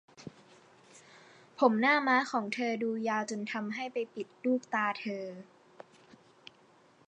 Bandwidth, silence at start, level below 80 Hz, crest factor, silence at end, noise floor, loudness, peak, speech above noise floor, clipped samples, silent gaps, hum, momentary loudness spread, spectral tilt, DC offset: 9.6 kHz; 0.2 s; -86 dBFS; 24 dB; 1.65 s; -63 dBFS; -31 LUFS; -10 dBFS; 32 dB; under 0.1%; none; none; 22 LU; -4.5 dB/octave; under 0.1%